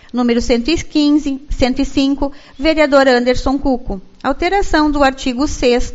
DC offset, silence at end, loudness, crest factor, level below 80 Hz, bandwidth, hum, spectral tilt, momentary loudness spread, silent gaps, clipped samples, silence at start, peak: under 0.1%; 0 s; -15 LUFS; 14 dB; -26 dBFS; 8 kHz; none; -4.5 dB/octave; 10 LU; none; under 0.1%; 0.15 s; 0 dBFS